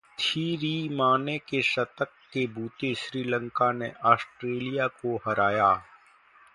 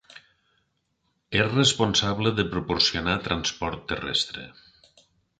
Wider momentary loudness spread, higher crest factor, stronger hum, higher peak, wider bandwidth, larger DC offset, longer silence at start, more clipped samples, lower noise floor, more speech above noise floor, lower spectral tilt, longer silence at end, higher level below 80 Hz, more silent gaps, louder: second, 8 LU vs 11 LU; about the same, 24 dB vs 22 dB; neither; about the same, -4 dBFS vs -6 dBFS; first, 11.5 kHz vs 9.4 kHz; neither; about the same, 0.2 s vs 0.15 s; neither; second, -57 dBFS vs -74 dBFS; second, 30 dB vs 49 dB; first, -5.5 dB/octave vs -3.5 dB/octave; second, 0.7 s vs 0.9 s; second, -66 dBFS vs -48 dBFS; neither; second, -27 LUFS vs -24 LUFS